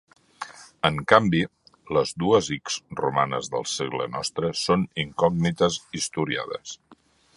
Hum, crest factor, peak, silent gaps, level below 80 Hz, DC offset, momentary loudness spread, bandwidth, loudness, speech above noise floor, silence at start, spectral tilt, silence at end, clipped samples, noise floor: none; 26 dB; 0 dBFS; none; -54 dBFS; under 0.1%; 15 LU; 11.5 kHz; -24 LUFS; 33 dB; 0.4 s; -4.5 dB/octave; 0.4 s; under 0.1%; -57 dBFS